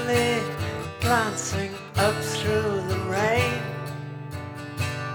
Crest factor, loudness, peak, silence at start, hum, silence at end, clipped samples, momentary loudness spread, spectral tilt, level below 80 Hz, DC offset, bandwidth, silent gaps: 18 dB; -26 LUFS; -8 dBFS; 0 s; none; 0 s; under 0.1%; 13 LU; -4.5 dB/octave; -50 dBFS; under 0.1%; over 20 kHz; none